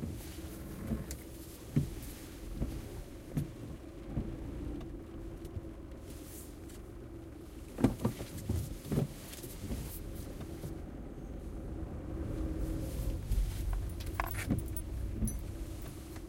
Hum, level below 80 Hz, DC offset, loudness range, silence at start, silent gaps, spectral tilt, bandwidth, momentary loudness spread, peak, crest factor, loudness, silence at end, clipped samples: none; -42 dBFS; under 0.1%; 6 LU; 0 s; none; -6.5 dB/octave; 16.5 kHz; 12 LU; -12 dBFS; 26 dB; -41 LUFS; 0 s; under 0.1%